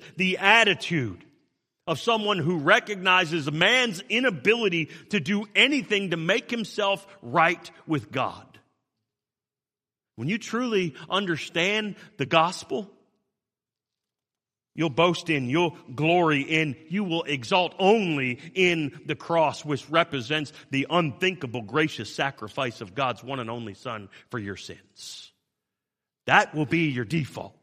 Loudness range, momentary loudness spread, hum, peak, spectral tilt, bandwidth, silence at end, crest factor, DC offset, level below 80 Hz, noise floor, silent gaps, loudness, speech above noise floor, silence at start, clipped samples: 8 LU; 14 LU; none; -2 dBFS; -4.5 dB/octave; 15 kHz; 0.15 s; 24 dB; under 0.1%; -68 dBFS; under -90 dBFS; none; -24 LUFS; over 65 dB; 0 s; under 0.1%